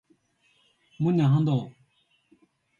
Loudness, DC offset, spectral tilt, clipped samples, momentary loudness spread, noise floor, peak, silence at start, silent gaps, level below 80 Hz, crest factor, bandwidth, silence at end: -24 LUFS; under 0.1%; -9.5 dB/octave; under 0.1%; 9 LU; -68 dBFS; -12 dBFS; 1 s; none; -70 dBFS; 16 dB; 7.2 kHz; 1.1 s